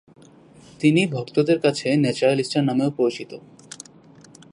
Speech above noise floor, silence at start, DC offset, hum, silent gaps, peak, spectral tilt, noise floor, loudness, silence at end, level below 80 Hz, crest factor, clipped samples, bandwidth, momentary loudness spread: 28 dB; 0.8 s; under 0.1%; none; none; -4 dBFS; -6 dB/octave; -49 dBFS; -21 LUFS; 1.15 s; -66 dBFS; 20 dB; under 0.1%; 11 kHz; 21 LU